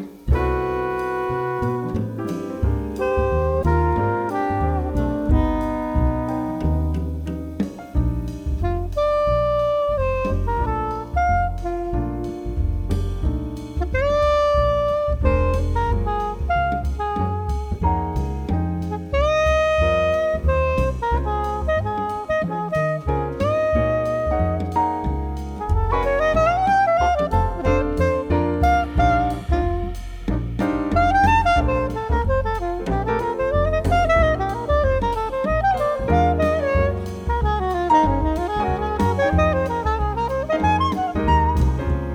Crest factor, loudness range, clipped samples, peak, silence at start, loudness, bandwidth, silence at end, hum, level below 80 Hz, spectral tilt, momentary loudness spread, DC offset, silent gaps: 16 dB; 4 LU; under 0.1%; -4 dBFS; 0 s; -21 LUFS; 10.5 kHz; 0 s; none; -26 dBFS; -7.5 dB/octave; 8 LU; under 0.1%; none